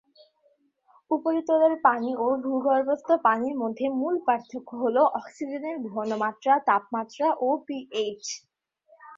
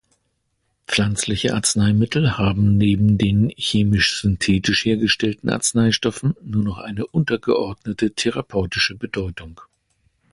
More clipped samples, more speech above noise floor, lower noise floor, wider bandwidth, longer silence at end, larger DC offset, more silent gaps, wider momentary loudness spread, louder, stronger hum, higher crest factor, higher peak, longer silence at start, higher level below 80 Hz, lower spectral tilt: neither; second, 42 dB vs 51 dB; about the same, -67 dBFS vs -70 dBFS; second, 7.8 kHz vs 11.5 kHz; second, 0 s vs 0.7 s; neither; neither; first, 11 LU vs 7 LU; second, -26 LUFS vs -19 LUFS; neither; first, 20 dB vs 14 dB; about the same, -6 dBFS vs -6 dBFS; first, 1.1 s vs 0.9 s; second, -76 dBFS vs -40 dBFS; about the same, -4 dB/octave vs -4.5 dB/octave